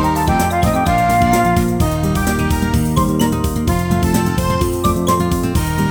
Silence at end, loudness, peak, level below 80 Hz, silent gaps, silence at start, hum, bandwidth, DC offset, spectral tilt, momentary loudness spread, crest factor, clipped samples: 0 s; -16 LUFS; 0 dBFS; -24 dBFS; none; 0 s; none; over 20 kHz; under 0.1%; -6 dB/octave; 4 LU; 14 dB; under 0.1%